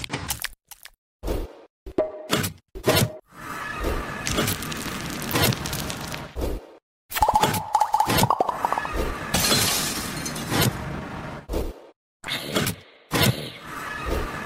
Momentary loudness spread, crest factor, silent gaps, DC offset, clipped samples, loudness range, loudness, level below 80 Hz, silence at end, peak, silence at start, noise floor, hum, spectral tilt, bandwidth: 14 LU; 22 dB; 0.98-1.19 s, 1.70-1.86 s, 6.82-7.09 s, 11.96-12.20 s; under 0.1%; under 0.1%; 5 LU; -25 LUFS; -38 dBFS; 0 s; -4 dBFS; 0 s; -46 dBFS; none; -3.5 dB/octave; 16.5 kHz